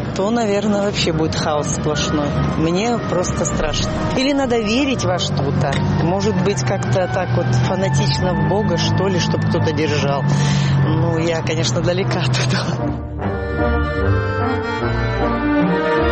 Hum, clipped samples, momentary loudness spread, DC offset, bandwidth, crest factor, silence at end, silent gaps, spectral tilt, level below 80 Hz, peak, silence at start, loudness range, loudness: none; under 0.1%; 3 LU; under 0.1%; 8.8 kHz; 10 dB; 0 s; none; -5.5 dB/octave; -32 dBFS; -6 dBFS; 0 s; 2 LU; -18 LUFS